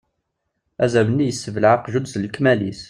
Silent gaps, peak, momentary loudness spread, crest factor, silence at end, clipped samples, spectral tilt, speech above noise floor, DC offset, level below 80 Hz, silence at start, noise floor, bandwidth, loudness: none; -2 dBFS; 7 LU; 18 dB; 0.05 s; under 0.1%; -6 dB/octave; 56 dB; under 0.1%; -56 dBFS; 0.8 s; -75 dBFS; 11.5 kHz; -19 LUFS